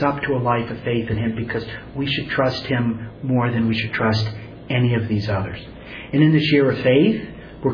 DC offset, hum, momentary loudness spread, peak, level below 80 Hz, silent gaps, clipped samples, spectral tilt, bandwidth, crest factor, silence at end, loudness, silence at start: under 0.1%; none; 12 LU; -4 dBFS; -46 dBFS; none; under 0.1%; -8 dB/octave; 5.4 kHz; 16 dB; 0 s; -20 LUFS; 0 s